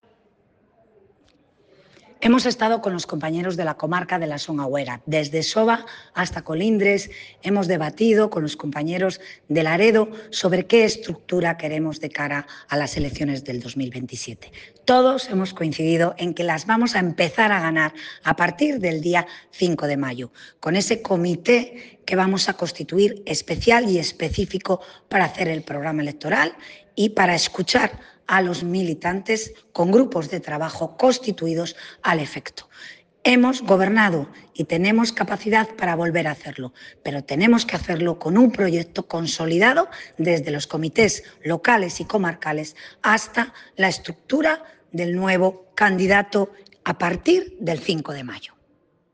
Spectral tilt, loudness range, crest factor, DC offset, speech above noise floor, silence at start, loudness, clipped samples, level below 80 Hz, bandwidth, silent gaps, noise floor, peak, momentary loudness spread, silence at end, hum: -5 dB/octave; 3 LU; 18 dB; under 0.1%; 42 dB; 2.2 s; -21 LUFS; under 0.1%; -52 dBFS; 10 kHz; none; -63 dBFS; -2 dBFS; 12 LU; 0.7 s; none